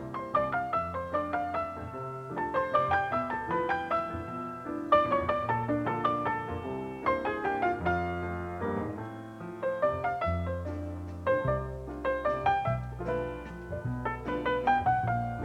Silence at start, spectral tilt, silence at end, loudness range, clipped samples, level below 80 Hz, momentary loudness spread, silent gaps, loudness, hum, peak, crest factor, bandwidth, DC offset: 0 s; -7.5 dB/octave; 0 s; 3 LU; under 0.1%; -50 dBFS; 11 LU; none; -31 LUFS; none; -10 dBFS; 20 dB; 14 kHz; under 0.1%